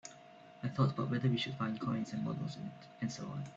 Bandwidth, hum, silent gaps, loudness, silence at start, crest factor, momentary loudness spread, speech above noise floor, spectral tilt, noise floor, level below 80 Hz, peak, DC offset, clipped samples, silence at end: 7.8 kHz; none; none; -37 LUFS; 0.05 s; 18 dB; 14 LU; 20 dB; -6.5 dB/octave; -57 dBFS; -70 dBFS; -20 dBFS; under 0.1%; under 0.1%; 0 s